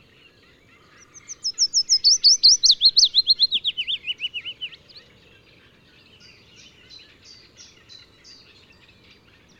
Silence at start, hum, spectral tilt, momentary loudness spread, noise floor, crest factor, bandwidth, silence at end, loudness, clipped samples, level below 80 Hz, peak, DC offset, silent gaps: 1.3 s; none; 3.5 dB/octave; 19 LU; -54 dBFS; 18 dB; 12 kHz; 4.85 s; -16 LUFS; under 0.1%; -64 dBFS; -4 dBFS; under 0.1%; none